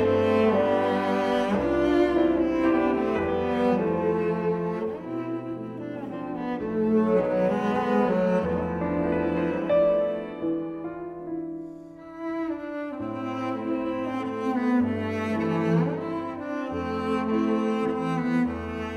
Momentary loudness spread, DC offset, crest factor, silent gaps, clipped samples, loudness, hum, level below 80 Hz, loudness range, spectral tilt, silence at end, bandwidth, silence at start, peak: 12 LU; under 0.1%; 14 dB; none; under 0.1%; -26 LUFS; none; -52 dBFS; 7 LU; -8 dB/octave; 0 s; 11 kHz; 0 s; -10 dBFS